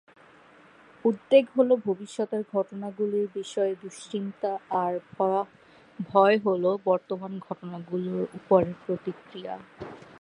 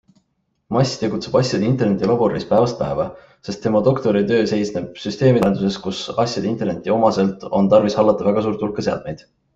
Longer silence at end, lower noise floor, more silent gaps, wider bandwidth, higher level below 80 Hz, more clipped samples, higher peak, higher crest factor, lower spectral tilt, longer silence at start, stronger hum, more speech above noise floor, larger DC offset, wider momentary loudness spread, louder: second, 0.15 s vs 0.4 s; second, -55 dBFS vs -69 dBFS; neither; first, 10.5 kHz vs 8 kHz; second, -68 dBFS vs -50 dBFS; neither; second, -6 dBFS vs -2 dBFS; about the same, 20 dB vs 16 dB; about the same, -6.5 dB/octave vs -6.5 dB/octave; first, 1.05 s vs 0.7 s; neither; second, 28 dB vs 51 dB; neither; first, 17 LU vs 10 LU; second, -27 LUFS vs -19 LUFS